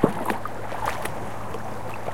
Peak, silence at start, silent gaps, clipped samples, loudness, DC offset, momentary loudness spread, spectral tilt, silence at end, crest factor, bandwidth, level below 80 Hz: -2 dBFS; 0 s; none; under 0.1%; -30 LUFS; 3%; 6 LU; -5.5 dB/octave; 0 s; 26 dB; 17 kHz; -48 dBFS